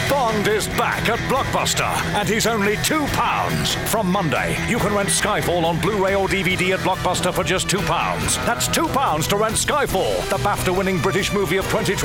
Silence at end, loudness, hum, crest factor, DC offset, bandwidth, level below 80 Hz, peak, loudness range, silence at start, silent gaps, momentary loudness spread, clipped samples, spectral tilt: 0 s; -19 LUFS; none; 10 dB; under 0.1%; 19 kHz; -38 dBFS; -10 dBFS; 0 LU; 0 s; none; 2 LU; under 0.1%; -3.5 dB/octave